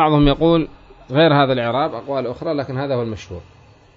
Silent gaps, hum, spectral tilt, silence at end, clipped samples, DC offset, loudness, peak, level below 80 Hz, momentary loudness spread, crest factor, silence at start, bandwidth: none; none; -8 dB/octave; 0.55 s; under 0.1%; under 0.1%; -18 LUFS; -2 dBFS; -36 dBFS; 15 LU; 16 dB; 0 s; 7 kHz